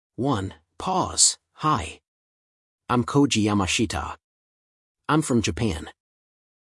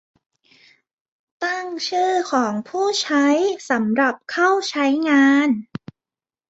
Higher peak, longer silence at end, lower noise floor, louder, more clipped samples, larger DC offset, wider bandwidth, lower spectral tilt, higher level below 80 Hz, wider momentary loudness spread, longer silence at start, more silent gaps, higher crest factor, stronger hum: about the same, -4 dBFS vs -4 dBFS; about the same, 0.8 s vs 0.85 s; about the same, under -90 dBFS vs under -90 dBFS; second, -23 LUFS vs -19 LUFS; neither; neither; first, 12 kHz vs 8 kHz; about the same, -3.5 dB/octave vs -3.5 dB/octave; first, -50 dBFS vs -68 dBFS; first, 18 LU vs 10 LU; second, 0.2 s vs 1.4 s; first, 2.08-2.78 s, 4.24-4.95 s vs none; first, 22 dB vs 16 dB; neither